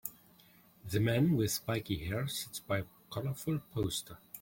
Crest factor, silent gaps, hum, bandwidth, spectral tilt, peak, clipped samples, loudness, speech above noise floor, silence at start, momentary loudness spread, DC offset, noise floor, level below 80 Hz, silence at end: 18 dB; none; none; 17 kHz; -5 dB/octave; -16 dBFS; under 0.1%; -35 LUFS; 29 dB; 0.05 s; 12 LU; under 0.1%; -63 dBFS; -58 dBFS; 0 s